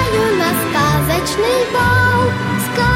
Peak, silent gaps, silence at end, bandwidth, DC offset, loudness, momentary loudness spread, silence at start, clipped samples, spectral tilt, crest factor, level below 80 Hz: -2 dBFS; none; 0 s; 16.5 kHz; under 0.1%; -15 LUFS; 4 LU; 0 s; under 0.1%; -5 dB/octave; 12 dB; -34 dBFS